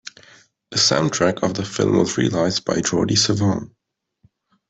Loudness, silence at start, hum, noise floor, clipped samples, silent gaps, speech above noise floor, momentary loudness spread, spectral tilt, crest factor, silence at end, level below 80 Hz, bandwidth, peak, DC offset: -19 LUFS; 0.05 s; none; -60 dBFS; under 0.1%; none; 41 dB; 7 LU; -4 dB/octave; 18 dB; 1.05 s; -54 dBFS; 8.4 kHz; -4 dBFS; under 0.1%